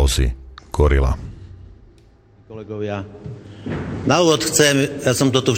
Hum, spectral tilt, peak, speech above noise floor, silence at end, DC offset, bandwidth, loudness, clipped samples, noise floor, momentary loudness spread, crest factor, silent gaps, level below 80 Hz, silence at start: none; -4.5 dB/octave; 0 dBFS; 32 dB; 0 s; under 0.1%; 17 kHz; -18 LUFS; under 0.1%; -50 dBFS; 22 LU; 18 dB; none; -26 dBFS; 0 s